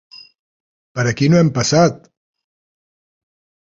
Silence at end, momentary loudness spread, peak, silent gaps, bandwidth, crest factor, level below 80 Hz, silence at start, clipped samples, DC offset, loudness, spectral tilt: 1.75 s; 8 LU; -2 dBFS; 0.39-0.95 s; 7.6 kHz; 18 dB; -52 dBFS; 0.15 s; under 0.1%; under 0.1%; -15 LUFS; -5.5 dB/octave